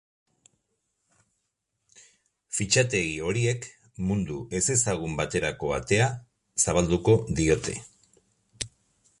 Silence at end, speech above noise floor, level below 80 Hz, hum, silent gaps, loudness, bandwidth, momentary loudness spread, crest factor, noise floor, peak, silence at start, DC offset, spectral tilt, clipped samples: 0.55 s; 54 dB; -46 dBFS; none; none; -26 LUFS; 11.5 kHz; 14 LU; 20 dB; -79 dBFS; -8 dBFS; 2.5 s; under 0.1%; -4 dB/octave; under 0.1%